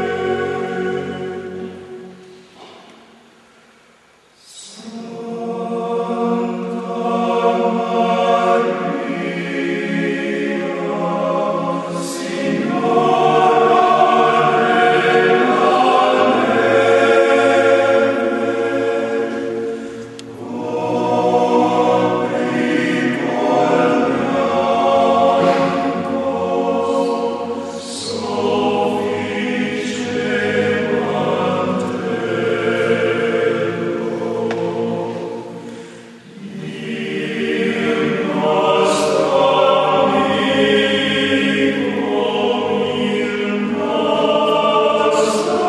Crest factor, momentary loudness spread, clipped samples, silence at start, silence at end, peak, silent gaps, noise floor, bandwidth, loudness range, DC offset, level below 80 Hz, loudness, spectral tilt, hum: 16 dB; 12 LU; under 0.1%; 0 s; 0 s; 0 dBFS; none; -51 dBFS; 12 kHz; 11 LU; under 0.1%; -62 dBFS; -17 LUFS; -5 dB/octave; none